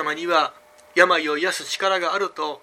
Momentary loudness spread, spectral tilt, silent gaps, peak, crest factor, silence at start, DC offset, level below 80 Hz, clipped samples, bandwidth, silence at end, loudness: 8 LU; -2 dB/octave; none; 0 dBFS; 22 dB; 0 s; under 0.1%; -76 dBFS; under 0.1%; 15.5 kHz; 0.05 s; -21 LUFS